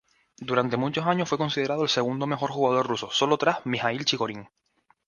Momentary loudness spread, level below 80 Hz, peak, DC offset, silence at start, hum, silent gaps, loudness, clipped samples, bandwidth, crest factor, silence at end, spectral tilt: 4 LU; -66 dBFS; -6 dBFS; under 0.1%; 0.4 s; none; none; -25 LUFS; under 0.1%; 10 kHz; 20 dB; 0.6 s; -4.5 dB/octave